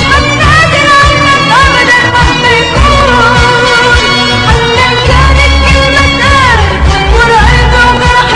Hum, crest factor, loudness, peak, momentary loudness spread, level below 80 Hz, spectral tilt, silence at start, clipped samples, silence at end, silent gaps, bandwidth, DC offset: none; 6 dB; -5 LUFS; 0 dBFS; 2 LU; -12 dBFS; -4 dB/octave; 0 s; 2%; 0 s; none; 11.5 kHz; under 0.1%